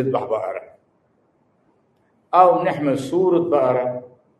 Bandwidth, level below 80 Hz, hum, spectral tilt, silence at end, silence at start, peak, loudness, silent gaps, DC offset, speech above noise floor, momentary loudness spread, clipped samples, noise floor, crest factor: 12 kHz; -66 dBFS; none; -7.5 dB/octave; 0.35 s; 0 s; 0 dBFS; -19 LUFS; none; under 0.1%; 44 dB; 14 LU; under 0.1%; -63 dBFS; 20 dB